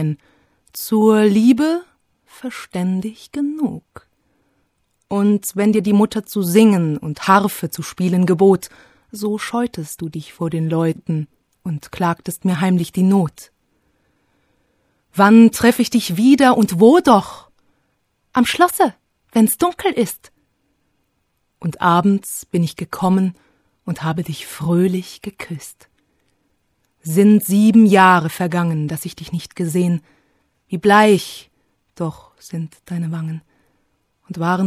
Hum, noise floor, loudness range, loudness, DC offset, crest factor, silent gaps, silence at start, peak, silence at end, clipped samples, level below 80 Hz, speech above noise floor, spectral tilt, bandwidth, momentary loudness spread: none; -68 dBFS; 8 LU; -16 LUFS; under 0.1%; 18 dB; none; 0 s; 0 dBFS; 0 s; under 0.1%; -56 dBFS; 52 dB; -6 dB/octave; 15.5 kHz; 18 LU